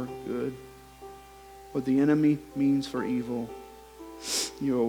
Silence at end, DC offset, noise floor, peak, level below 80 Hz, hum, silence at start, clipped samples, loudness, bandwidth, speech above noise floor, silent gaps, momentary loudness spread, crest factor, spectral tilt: 0 s; under 0.1%; -49 dBFS; -12 dBFS; -58 dBFS; none; 0 s; under 0.1%; -28 LUFS; 19 kHz; 23 dB; none; 24 LU; 18 dB; -5 dB/octave